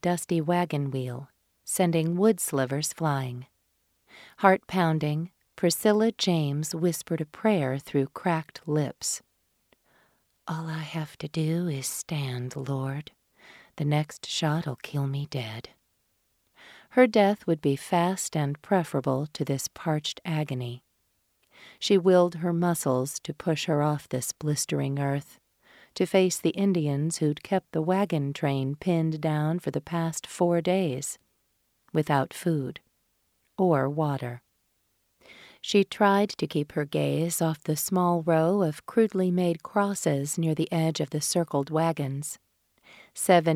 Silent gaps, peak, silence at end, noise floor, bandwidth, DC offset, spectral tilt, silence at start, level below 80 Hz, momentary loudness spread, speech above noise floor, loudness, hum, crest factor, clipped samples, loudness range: none; -4 dBFS; 0 s; -73 dBFS; 16 kHz; under 0.1%; -5.5 dB/octave; 0.05 s; -68 dBFS; 11 LU; 46 dB; -27 LUFS; none; 22 dB; under 0.1%; 6 LU